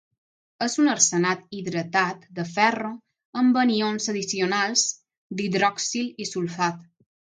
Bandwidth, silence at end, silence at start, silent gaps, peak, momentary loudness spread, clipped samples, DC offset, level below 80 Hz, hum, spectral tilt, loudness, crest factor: 10 kHz; 0.55 s; 0.6 s; 3.25-3.33 s, 5.18-5.30 s; -4 dBFS; 13 LU; under 0.1%; under 0.1%; -74 dBFS; none; -3 dB/octave; -23 LUFS; 22 dB